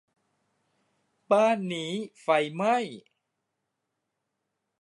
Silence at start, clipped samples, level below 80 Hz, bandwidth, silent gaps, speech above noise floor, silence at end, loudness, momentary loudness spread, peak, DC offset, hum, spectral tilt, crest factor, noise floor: 1.3 s; under 0.1%; -84 dBFS; 11.5 kHz; none; 56 dB; 1.8 s; -26 LUFS; 11 LU; -10 dBFS; under 0.1%; none; -5 dB/octave; 20 dB; -82 dBFS